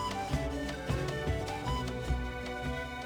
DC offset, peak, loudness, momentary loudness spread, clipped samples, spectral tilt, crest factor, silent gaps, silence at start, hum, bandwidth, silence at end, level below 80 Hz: under 0.1%; -18 dBFS; -35 LUFS; 3 LU; under 0.1%; -5.5 dB/octave; 16 dB; none; 0 s; none; over 20 kHz; 0 s; -40 dBFS